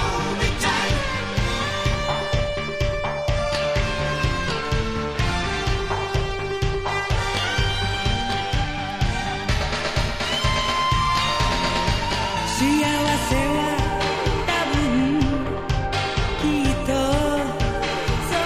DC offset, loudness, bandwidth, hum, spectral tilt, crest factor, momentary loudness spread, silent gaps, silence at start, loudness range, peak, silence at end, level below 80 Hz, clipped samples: under 0.1%; -22 LUFS; 15.5 kHz; none; -4.5 dB/octave; 16 dB; 4 LU; none; 0 s; 3 LU; -6 dBFS; 0 s; -30 dBFS; under 0.1%